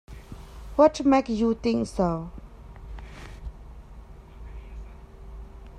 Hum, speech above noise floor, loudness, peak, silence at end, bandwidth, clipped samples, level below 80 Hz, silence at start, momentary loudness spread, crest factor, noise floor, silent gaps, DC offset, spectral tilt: none; 23 dB; -24 LUFS; -6 dBFS; 0 s; 11.5 kHz; under 0.1%; -42 dBFS; 0.1 s; 26 LU; 22 dB; -45 dBFS; none; under 0.1%; -6.5 dB/octave